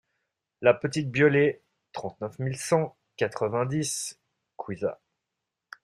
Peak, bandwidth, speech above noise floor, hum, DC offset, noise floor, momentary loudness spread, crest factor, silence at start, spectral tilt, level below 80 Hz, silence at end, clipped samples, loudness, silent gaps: -6 dBFS; 13 kHz; 59 dB; none; under 0.1%; -85 dBFS; 16 LU; 22 dB; 0.6 s; -5 dB/octave; -66 dBFS; 0.9 s; under 0.1%; -27 LUFS; none